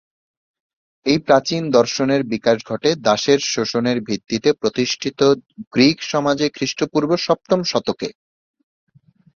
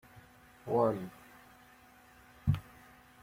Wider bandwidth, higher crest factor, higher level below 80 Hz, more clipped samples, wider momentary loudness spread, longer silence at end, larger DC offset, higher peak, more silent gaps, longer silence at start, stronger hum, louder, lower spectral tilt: second, 7.4 kHz vs 16.5 kHz; about the same, 18 dB vs 22 dB; about the same, -58 dBFS vs -56 dBFS; neither; second, 7 LU vs 27 LU; first, 1.25 s vs 0.6 s; neither; first, -2 dBFS vs -16 dBFS; first, 5.67-5.71 s vs none; first, 1.05 s vs 0.15 s; neither; first, -18 LUFS vs -34 LUFS; second, -4.5 dB/octave vs -8.5 dB/octave